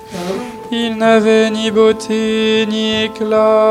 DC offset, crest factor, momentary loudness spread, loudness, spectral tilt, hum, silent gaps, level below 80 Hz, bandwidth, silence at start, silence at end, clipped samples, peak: under 0.1%; 12 dB; 11 LU; -14 LUFS; -4.5 dB/octave; none; none; -52 dBFS; 13 kHz; 0 s; 0 s; under 0.1%; -2 dBFS